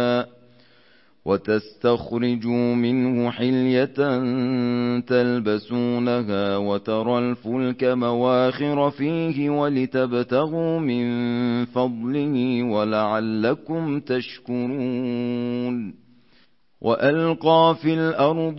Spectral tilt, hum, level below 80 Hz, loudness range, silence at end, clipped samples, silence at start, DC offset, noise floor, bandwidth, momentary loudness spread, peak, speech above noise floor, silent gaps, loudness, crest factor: -11 dB/octave; none; -62 dBFS; 3 LU; 0 s; under 0.1%; 0 s; 0.1%; -61 dBFS; 5.8 kHz; 6 LU; -6 dBFS; 39 dB; none; -22 LUFS; 16 dB